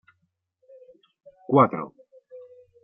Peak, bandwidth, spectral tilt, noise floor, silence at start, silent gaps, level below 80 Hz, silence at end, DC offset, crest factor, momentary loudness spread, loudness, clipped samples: -6 dBFS; 3.6 kHz; -7.5 dB/octave; -74 dBFS; 1.5 s; none; -76 dBFS; 0.45 s; under 0.1%; 22 dB; 27 LU; -22 LUFS; under 0.1%